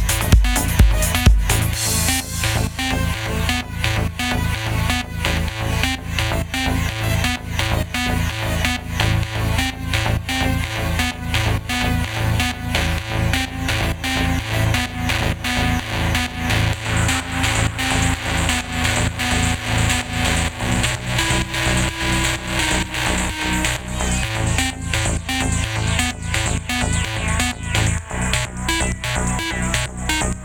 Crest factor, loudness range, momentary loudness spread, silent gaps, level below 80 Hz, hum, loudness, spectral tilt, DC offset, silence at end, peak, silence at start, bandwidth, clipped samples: 20 dB; 2 LU; 4 LU; none; -26 dBFS; none; -20 LUFS; -3.5 dB/octave; under 0.1%; 0 s; 0 dBFS; 0 s; 19 kHz; under 0.1%